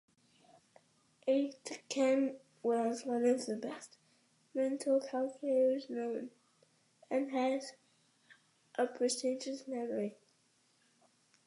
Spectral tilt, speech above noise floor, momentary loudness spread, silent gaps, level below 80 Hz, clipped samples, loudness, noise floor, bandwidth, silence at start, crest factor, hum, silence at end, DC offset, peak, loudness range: -4 dB/octave; 39 dB; 12 LU; none; under -90 dBFS; under 0.1%; -36 LUFS; -73 dBFS; 11.5 kHz; 1.25 s; 18 dB; none; 1.35 s; under 0.1%; -20 dBFS; 5 LU